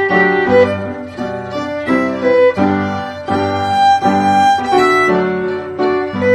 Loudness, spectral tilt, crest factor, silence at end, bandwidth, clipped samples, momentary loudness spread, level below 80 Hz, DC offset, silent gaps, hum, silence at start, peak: -14 LUFS; -6 dB/octave; 14 dB; 0 s; 14 kHz; under 0.1%; 11 LU; -52 dBFS; under 0.1%; none; none; 0 s; 0 dBFS